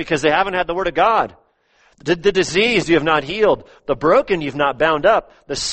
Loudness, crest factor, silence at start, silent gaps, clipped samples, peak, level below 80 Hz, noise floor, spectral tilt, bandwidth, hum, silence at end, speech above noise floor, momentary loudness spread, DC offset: -17 LUFS; 16 dB; 0 s; none; under 0.1%; -2 dBFS; -44 dBFS; -58 dBFS; -4 dB/octave; 8.8 kHz; none; 0 s; 40 dB; 8 LU; under 0.1%